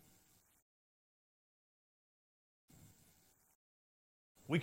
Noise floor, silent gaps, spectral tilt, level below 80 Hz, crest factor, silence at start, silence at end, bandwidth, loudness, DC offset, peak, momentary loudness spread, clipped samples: -72 dBFS; none; -6.5 dB/octave; -82 dBFS; 28 dB; 4.5 s; 0 s; 16 kHz; -40 LUFS; under 0.1%; -22 dBFS; 18 LU; under 0.1%